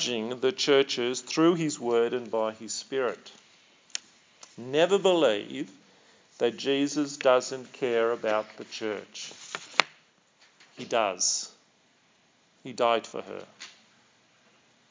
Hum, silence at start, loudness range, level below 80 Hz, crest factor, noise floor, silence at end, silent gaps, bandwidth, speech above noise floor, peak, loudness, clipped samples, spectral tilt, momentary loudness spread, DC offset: none; 0 s; 5 LU; -84 dBFS; 28 dB; -65 dBFS; 1.2 s; none; 7.8 kHz; 37 dB; 0 dBFS; -27 LUFS; under 0.1%; -3 dB/octave; 18 LU; under 0.1%